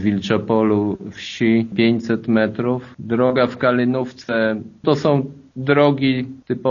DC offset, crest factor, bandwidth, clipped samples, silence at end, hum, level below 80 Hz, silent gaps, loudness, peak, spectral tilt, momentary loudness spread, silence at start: under 0.1%; 18 dB; 7.2 kHz; under 0.1%; 0 s; none; -56 dBFS; none; -19 LUFS; -2 dBFS; -5.5 dB/octave; 8 LU; 0 s